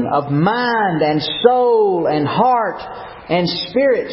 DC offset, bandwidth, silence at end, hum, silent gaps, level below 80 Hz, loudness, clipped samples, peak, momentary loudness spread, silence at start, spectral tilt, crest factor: under 0.1%; 5.8 kHz; 0 s; none; none; -52 dBFS; -16 LUFS; under 0.1%; 0 dBFS; 8 LU; 0 s; -10 dB/octave; 16 dB